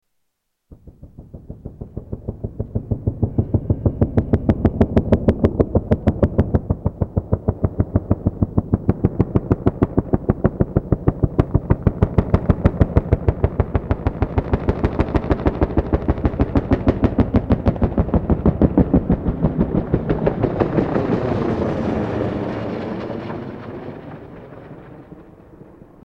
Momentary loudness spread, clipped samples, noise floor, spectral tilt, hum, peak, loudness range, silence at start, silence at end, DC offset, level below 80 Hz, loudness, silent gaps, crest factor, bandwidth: 14 LU; under 0.1%; -72 dBFS; -10.5 dB/octave; none; 0 dBFS; 7 LU; 0.7 s; 0.35 s; under 0.1%; -28 dBFS; -20 LUFS; none; 18 dB; 5.8 kHz